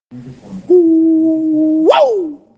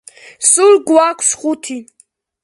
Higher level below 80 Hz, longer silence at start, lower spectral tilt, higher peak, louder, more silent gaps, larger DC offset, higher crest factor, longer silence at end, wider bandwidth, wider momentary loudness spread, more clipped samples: about the same, -60 dBFS vs -64 dBFS; second, 0.1 s vs 0.4 s; first, -7 dB/octave vs -1 dB/octave; about the same, 0 dBFS vs 0 dBFS; about the same, -11 LUFS vs -12 LUFS; neither; neither; about the same, 12 dB vs 14 dB; second, 0.2 s vs 0.6 s; second, 7.2 kHz vs 11.5 kHz; second, 11 LU vs 15 LU; neither